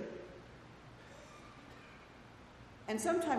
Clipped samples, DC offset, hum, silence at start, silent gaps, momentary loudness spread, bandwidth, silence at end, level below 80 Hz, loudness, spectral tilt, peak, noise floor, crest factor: under 0.1%; under 0.1%; none; 0 s; none; 20 LU; 13.5 kHz; 0 s; -66 dBFS; -42 LUFS; -4.5 dB/octave; -22 dBFS; -57 dBFS; 20 dB